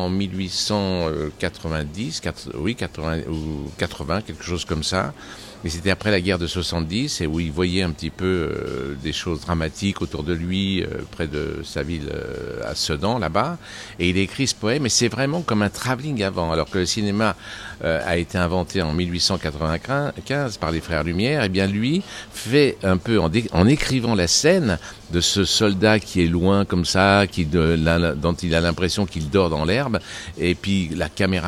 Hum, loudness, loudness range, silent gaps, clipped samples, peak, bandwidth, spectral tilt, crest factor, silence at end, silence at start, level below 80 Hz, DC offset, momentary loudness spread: none; -22 LUFS; 7 LU; none; under 0.1%; 0 dBFS; 15 kHz; -4.5 dB/octave; 22 dB; 0 s; 0 s; -42 dBFS; under 0.1%; 10 LU